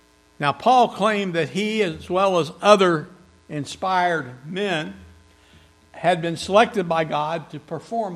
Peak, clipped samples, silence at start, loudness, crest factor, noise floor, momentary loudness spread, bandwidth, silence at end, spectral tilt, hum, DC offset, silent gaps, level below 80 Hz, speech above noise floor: 0 dBFS; under 0.1%; 0.4 s; -21 LUFS; 22 dB; -53 dBFS; 15 LU; 13 kHz; 0 s; -5 dB/octave; none; under 0.1%; none; -60 dBFS; 32 dB